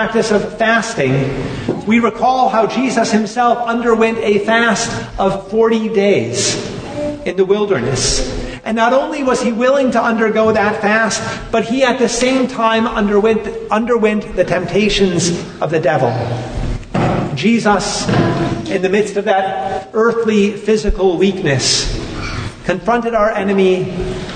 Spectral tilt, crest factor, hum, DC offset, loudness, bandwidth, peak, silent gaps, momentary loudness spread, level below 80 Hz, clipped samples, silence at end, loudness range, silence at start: -4.5 dB/octave; 14 dB; none; under 0.1%; -15 LUFS; 9.6 kHz; 0 dBFS; none; 8 LU; -32 dBFS; under 0.1%; 0 s; 2 LU; 0 s